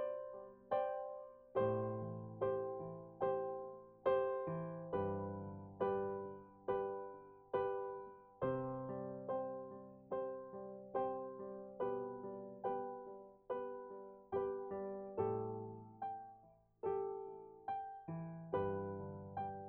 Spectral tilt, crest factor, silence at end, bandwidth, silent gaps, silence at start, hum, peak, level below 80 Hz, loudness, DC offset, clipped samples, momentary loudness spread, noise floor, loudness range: -7.5 dB/octave; 18 dB; 0 s; 4.2 kHz; none; 0 s; none; -24 dBFS; -74 dBFS; -44 LUFS; under 0.1%; under 0.1%; 12 LU; -67 dBFS; 4 LU